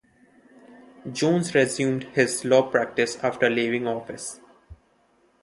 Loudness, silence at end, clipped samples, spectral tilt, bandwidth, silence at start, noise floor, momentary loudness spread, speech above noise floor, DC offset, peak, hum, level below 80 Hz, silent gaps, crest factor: -23 LUFS; 0.7 s; under 0.1%; -4.5 dB/octave; 12 kHz; 1.05 s; -63 dBFS; 15 LU; 40 dB; under 0.1%; -4 dBFS; none; -62 dBFS; none; 22 dB